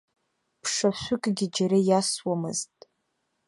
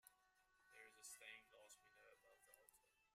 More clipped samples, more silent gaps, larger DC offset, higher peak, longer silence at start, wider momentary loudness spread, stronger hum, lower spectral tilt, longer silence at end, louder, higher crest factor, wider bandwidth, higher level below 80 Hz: neither; neither; neither; first, -10 dBFS vs -44 dBFS; first, 0.65 s vs 0.05 s; about the same, 10 LU vs 9 LU; neither; first, -4.5 dB/octave vs 1 dB/octave; first, 0.85 s vs 0 s; first, -26 LUFS vs -62 LUFS; second, 18 dB vs 24 dB; second, 11.5 kHz vs 15.5 kHz; first, -64 dBFS vs under -90 dBFS